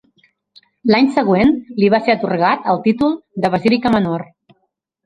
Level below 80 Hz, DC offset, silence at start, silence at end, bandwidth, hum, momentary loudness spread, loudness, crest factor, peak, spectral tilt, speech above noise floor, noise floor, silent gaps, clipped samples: -48 dBFS; under 0.1%; 0.85 s; 0.8 s; 10.5 kHz; none; 6 LU; -16 LUFS; 16 dB; 0 dBFS; -7.5 dB/octave; 54 dB; -69 dBFS; none; under 0.1%